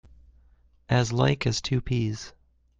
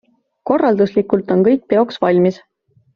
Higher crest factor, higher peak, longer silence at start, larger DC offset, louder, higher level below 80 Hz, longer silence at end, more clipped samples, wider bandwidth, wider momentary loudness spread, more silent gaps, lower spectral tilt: about the same, 20 dB vs 16 dB; second, -8 dBFS vs 0 dBFS; first, 0.9 s vs 0.45 s; neither; second, -26 LUFS vs -15 LUFS; first, -46 dBFS vs -58 dBFS; about the same, 0.5 s vs 0.6 s; neither; first, 7.8 kHz vs 6.8 kHz; first, 11 LU vs 5 LU; neither; about the same, -5.5 dB/octave vs -6.5 dB/octave